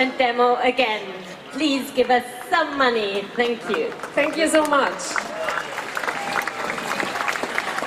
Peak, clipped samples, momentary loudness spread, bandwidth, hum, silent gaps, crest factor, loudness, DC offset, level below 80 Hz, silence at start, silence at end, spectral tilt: -4 dBFS; under 0.1%; 8 LU; 15.5 kHz; none; none; 18 dB; -22 LUFS; under 0.1%; -62 dBFS; 0 s; 0 s; -2.5 dB/octave